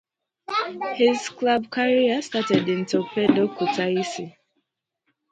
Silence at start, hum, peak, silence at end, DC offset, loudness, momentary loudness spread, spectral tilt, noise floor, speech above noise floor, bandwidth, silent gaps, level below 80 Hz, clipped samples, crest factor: 0.5 s; none; -4 dBFS; 1 s; under 0.1%; -23 LUFS; 7 LU; -5 dB/octave; -76 dBFS; 54 dB; 9.2 kHz; none; -68 dBFS; under 0.1%; 20 dB